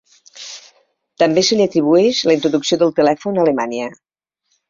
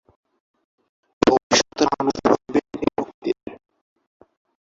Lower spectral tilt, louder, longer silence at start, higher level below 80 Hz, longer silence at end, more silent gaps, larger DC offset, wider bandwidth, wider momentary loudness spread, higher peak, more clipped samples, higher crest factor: about the same, -4.5 dB/octave vs -3.5 dB/octave; first, -15 LUFS vs -21 LUFS; second, 0.35 s vs 1.25 s; second, -60 dBFS vs -54 dBFS; second, 0.75 s vs 1.15 s; second, none vs 1.43-1.50 s, 3.14-3.22 s; neither; about the same, 7.6 kHz vs 7.8 kHz; first, 19 LU vs 10 LU; about the same, -2 dBFS vs -2 dBFS; neither; second, 16 dB vs 22 dB